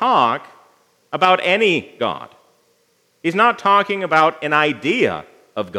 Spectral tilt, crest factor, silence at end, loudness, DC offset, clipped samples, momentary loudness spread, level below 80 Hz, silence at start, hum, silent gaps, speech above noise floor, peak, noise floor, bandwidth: -5 dB/octave; 18 dB; 0 s; -17 LUFS; under 0.1%; under 0.1%; 14 LU; -70 dBFS; 0 s; none; none; 45 dB; 0 dBFS; -61 dBFS; 13.5 kHz